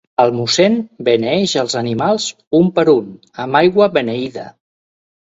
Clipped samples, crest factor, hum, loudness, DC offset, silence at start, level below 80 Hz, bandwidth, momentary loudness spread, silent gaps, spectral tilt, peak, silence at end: under 0.1%; 16 dB; none; -15 LUFS; under 0.1%; 0.2 s; -56 dBFS; 8 kHz; 10 LU; 2.47-2.51 s; -5 dB/octave; 0 dBFS; 0.75 s